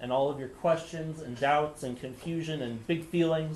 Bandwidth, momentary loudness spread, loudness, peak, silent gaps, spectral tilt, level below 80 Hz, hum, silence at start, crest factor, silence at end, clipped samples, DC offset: 12.5 kHz; 11 LU; -31 LUFS; -14 dBFS; none; -6 dB/octave; -60 dBFS; none; 0 s; 16 dB; 0 s; under 0.1%; under 0.1%